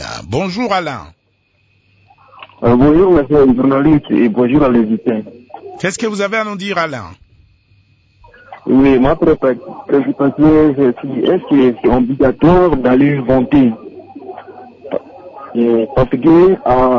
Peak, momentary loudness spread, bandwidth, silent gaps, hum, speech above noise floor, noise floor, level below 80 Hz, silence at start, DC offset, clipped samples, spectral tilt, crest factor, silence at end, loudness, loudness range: -2 dBFS; 16 LU; 8 kHz; none; none; 47 dB; -59 dBFS; -34 dBFS; 0 s; under 0.1%; under 0.1%; -7.5 dB/octave; 10 dB; 0 s; -12 LUFS; 5 LU